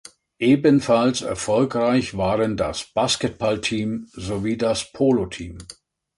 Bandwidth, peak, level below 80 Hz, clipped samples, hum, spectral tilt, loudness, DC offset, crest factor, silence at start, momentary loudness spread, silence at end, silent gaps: 11.5 kHz; -4 dBFS; -46 dBFS; under 0.1%; none; -5 dB/octave; -21 LUFS; under 0.1%; 16 dB; 0.4 s; 13 LU; 0.45 s; none